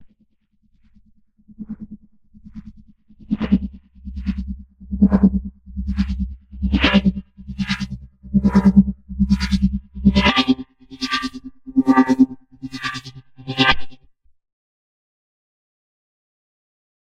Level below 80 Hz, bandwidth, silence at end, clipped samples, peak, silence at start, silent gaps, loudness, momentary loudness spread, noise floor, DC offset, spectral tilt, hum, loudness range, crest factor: -32 dBFS; 8.8 kHz; 3.2 s; under 0.1%; 0 dBFS; 0 s; none; -19 LUFS; 21 LU; -63 dBFS; under 0.1%; -6.5 dB/octave; none; 10 LU; 20 dB